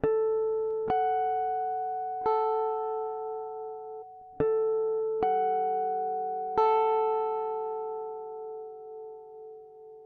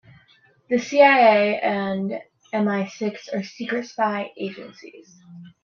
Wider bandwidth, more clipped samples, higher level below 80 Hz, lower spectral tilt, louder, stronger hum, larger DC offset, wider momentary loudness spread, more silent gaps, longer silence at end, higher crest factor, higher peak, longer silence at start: second, 4.7 kHz vs 7.2 kHz; neither; first, -64 dBFS vs -70 dBFS; first, -8 dB/octave vs -5.5 dB/octave; second, -30 LUFS vs -21 LUFS; neither; neither; about the same, 17 LU vs 17 LU; neither; second, 0 s vs 0.15 s; about the same, 16 dB vs 20 dB; second, -12 dBFS vs -2 dBFS; second, 0.05 s vs 0.7 s